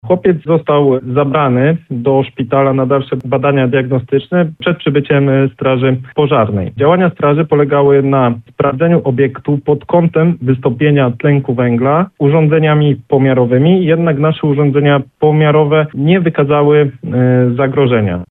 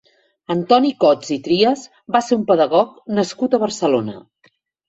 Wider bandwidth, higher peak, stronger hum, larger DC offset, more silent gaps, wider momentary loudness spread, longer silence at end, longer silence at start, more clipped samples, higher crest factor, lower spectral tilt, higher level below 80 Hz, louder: second, 4 kHz vs 8.2 kHz; about the same, 0 dBFS vs -2 dBFS; neither; neither; neither; about the same, 5 LU vs 7 LU; second, 0.05 s vs 0.7 s; second, 0.05 s vs 0.5 s; neither; second, 10 dB vs 16 dB; first, -11 dB/octave vs -5 dB/octave; first, -48 dBFS vs -62 dBFS; first, -12 LUFS vs -17 LUFS